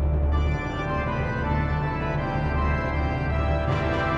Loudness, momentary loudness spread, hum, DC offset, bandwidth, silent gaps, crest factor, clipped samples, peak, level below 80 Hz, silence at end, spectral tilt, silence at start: -26 LUFS; 2 LU; none; under 0.1%; 6.8 kHz; none; 12 dB; under 0.1%; -12 dBFS; -28 dBFS; 0 s; -8 dB/octave; 0 s